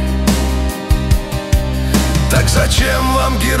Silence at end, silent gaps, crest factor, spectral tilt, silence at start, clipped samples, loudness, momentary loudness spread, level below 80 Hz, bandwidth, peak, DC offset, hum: 0 s; none; 14 dB; -4.5 dB/octave; 0 s; under 0.1%; -15 LUFS; 5 LU; -16 dBFS; 16.5 kHz; 0 dBFS; under 0.1%; none